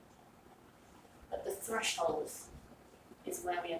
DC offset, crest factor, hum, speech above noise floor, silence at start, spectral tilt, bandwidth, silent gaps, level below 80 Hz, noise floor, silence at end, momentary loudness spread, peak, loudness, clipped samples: under 0.1%; 18 dB; none; 23 dB; 0 s; -2 dB/octave; 16 kHz; none; -66 dBFS; -61 dBFS; 0 s; 26 LU; -22 dBFS; -38 LUFS; under 0.1%